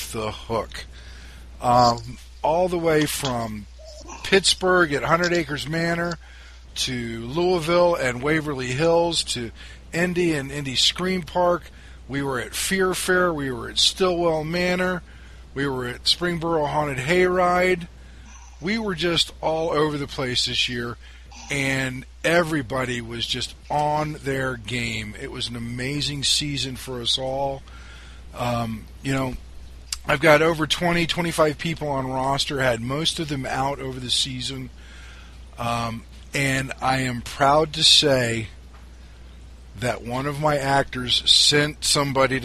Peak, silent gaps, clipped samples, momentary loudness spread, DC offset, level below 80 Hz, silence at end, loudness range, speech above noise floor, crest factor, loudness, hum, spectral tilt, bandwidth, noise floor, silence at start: -2 dBFS; none; under 0.1%; 13 LU; under 0.1%; -42 dBFS; 0 s; 5 LU; 20 dB; 22 dB; -22 LUFS; none; -3.5 dB/octave; 14 kHz; -43 dBFS; 0 s